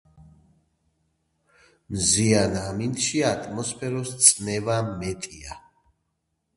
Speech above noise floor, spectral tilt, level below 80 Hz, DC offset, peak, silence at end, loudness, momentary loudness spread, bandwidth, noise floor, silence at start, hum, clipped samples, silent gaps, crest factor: 52 dB; -3.5 dB/octave; -50 dBFS; under 0.1%; 0 dBFS; 1 s; -22 LUFS; 18 LU; 12 kHz; -76 dBFS; 0.2 s; none; under 0.1%; none; 26 dB